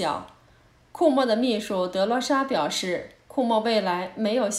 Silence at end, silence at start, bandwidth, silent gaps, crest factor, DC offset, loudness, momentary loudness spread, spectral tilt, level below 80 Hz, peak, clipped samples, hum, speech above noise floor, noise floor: 0 s; 0 s; 15.5 kHz; none; 18 dB; under 0.1%; -24 LUFS; 7 LU; -4 dB/octave; -64 dBFS; -6 dBFS; under 0.1%; none; 33 dB; -57 dBFS